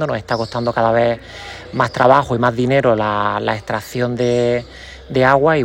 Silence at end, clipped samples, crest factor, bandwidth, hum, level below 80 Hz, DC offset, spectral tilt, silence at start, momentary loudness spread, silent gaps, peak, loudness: 0 s; under 0.1%; 16 dB; 16.5 kHz; none; -44 dBFS; under 0.1%; -6.5 dB/octave; 0 s; 13 LU; none; 0 dBFS; -17 LUFS